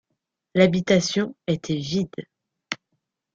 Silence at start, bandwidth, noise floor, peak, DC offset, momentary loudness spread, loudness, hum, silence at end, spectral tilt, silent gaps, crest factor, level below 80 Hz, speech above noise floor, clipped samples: 0.55 s; 7.6 kHz; -79 dBFS; -4 dBFS; under 0.1%; 14 LU; -23 LUFS; none; 0.6 s; -5.5 dB/octave; none; 22 dB; -58 dBFS; 57 dB; under 0.1%